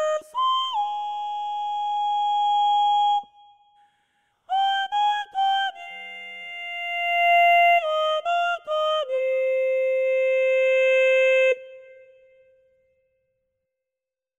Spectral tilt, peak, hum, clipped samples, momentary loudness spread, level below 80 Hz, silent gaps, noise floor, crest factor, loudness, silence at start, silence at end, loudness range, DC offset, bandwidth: 1.5 dB/octave; -10 dBFS; none; under 0.1%; 11 LU; -82 dBFS; none; -88 dBFS; 14 dB; -22 LUFS; 0 s; 2.55 s; 5 LU; under 0.1%; 14 kHz